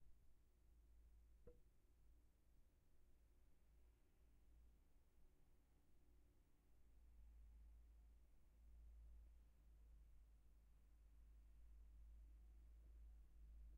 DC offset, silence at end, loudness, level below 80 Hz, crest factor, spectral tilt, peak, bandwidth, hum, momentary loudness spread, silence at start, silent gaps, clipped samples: under 0.1%; 0 s; -69 LUFS; -68 dBFS; 16 dB; -8 dB/octave; -52 dBFS; 2.9 kHz; none; 2 LU; 0 s; none; under 0.1%